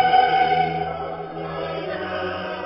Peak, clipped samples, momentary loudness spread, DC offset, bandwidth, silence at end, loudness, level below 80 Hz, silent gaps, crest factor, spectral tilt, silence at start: -6 dBFS; under 0.1%; 13 LU; under 0.1%; 5.8 kHz; 0 s; -23 LUFS; -50 dBFS; none; 16 dB; -9.5 dB/octave; 0 s